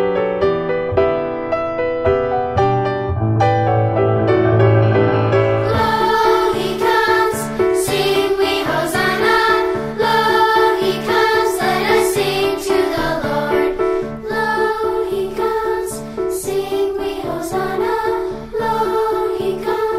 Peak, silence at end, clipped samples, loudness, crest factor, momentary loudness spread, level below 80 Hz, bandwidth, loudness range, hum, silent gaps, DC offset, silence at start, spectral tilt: -2 dBFS; 0 s; under 0.1%; -17 LUFS; 14 dB; 7 LU; -40 dBFS; 16 kHz; 5 LU; none; none; under 0.1%; 0 s; -5.5 dB/octave